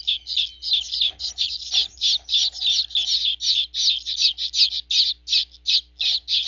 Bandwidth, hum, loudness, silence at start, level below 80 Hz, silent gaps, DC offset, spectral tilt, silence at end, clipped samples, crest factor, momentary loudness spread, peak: 7.6 kHz; 60 Hz at -55 dBFS; -19 LUFS; 0.05 s; -54 dBFS; none; under 0.1%; 3 dB/octave; 0 s; under 0.1%; 18 dB; 4 LU; -4 dBFS